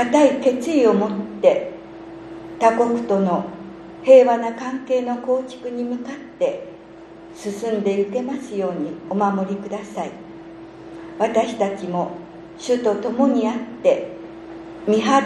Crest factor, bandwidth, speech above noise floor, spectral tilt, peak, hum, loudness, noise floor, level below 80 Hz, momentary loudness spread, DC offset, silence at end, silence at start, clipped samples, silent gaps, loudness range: 20 dB; 11 kHz; 22 dB; -6 dB/octave; -2 dBFS; none; -20 LUFS; -41 dBFS; -60 dBFS; 21 LU; under 0.1%; 0 s; 0 s; under 0.1%; none; 7 LU